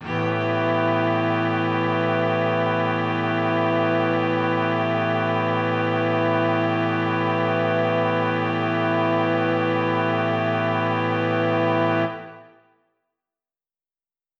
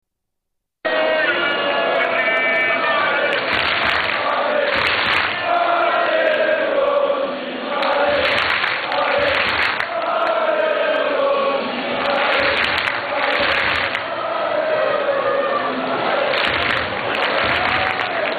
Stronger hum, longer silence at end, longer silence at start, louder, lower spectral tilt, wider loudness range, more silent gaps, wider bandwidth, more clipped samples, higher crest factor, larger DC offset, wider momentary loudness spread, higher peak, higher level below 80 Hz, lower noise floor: neither; first, 1.95 s vs 0 s; second, 0 s vs 0.85 s; second, -22 LUFS vs -18 LUFS; first, -8 dB/octave vs -4.5 dB/octave; about the same, 2 LU vs 2 LU; neither; second, 7.2 kHz vs 11.5 kHz; neither; about the same, 12 dB vs 12 dB; neither; about the same, 2 LU vs 4 LU; second, -10 dBFS vs -6 dBFS; second, -72 dBFS vs -50 dBFS; first, under -90 dBFS vs -77 dBFS